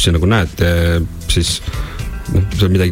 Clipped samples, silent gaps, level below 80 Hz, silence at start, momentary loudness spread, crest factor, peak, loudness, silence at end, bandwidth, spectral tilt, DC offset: under 0.1%; none; -24 dBFS; 0 s; 11 LU; 14 dB; -2 dBFS; -16 LUFS; 0 s; 16.5 kHz; -5 dB/octave; under 0.1%